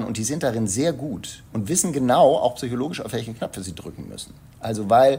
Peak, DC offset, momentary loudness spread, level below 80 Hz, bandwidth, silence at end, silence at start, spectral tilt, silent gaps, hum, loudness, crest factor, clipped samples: -4 dBFS; under 0.1%; 19 LU; -52 dBFS; 16 kHz; 0 s; 0 s; -4.5 dB/octave; none; none; -22 LUFS; 18 dB; under 0.1%